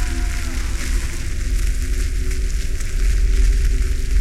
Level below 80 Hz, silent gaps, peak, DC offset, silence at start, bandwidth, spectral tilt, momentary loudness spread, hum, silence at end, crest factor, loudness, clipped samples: -18 dBFS; none; -6 dBFS; under 0.1%; 0 s; 13.5 kHz; -4.5 dB/octave; 6 LU; none; 0 s; 12 dB; -23 LUFS; under 0.1%